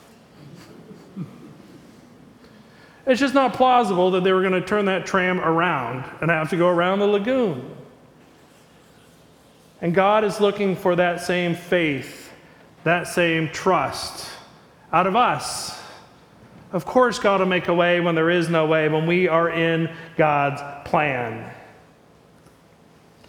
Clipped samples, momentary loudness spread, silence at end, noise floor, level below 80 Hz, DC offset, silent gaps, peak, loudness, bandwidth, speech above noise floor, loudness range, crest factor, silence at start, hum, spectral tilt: under 0.1%; 14 LU; 1.65 s; -52 dBFS; -58 dBFS; under 0.1%; none; -4 dBFS; -20 LUFS; 18 kHz; 32 dB; 5 LU; 18 dB; 0.4 s; none; -5.5 dB/octave